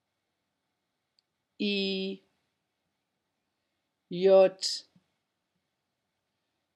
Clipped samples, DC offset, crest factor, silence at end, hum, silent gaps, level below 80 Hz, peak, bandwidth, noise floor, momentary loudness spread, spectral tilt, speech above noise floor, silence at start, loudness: under 0.1%; under 0.1%; 22 dB; 1.95 s; none; none; under -90 dBFS; -10 dBFS; 11.5 kHz; -83 dBFS; 17 LU; -4.5 dB/octave; 57 dB; 1.6 s; -27 LUFS